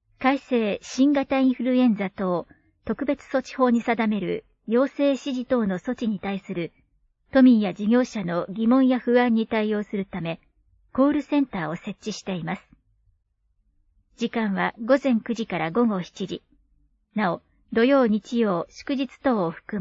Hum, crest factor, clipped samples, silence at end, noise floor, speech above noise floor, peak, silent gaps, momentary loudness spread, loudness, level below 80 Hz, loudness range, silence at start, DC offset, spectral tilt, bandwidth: none; 16 dB; under 0.1%; 0 s; -69 dBFS; 47 dB; -8 dBFS; none; 13 LU; -24 LUFS; -60 dBFS; 6 LU; 0.2 s; under 0.1%; -6.5 dB/octave; 7.6 kHz